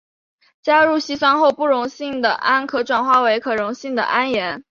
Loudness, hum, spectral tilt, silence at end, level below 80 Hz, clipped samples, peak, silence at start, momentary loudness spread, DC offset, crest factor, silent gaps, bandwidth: -18 LUFS; none; -3.5 dB/octave; 0.1 s; -62 dBFS; under 0.1%; -2 dBFS; 0.65 s; 8 LU; under 0.1%; 16 dB; none; 7.4 kHz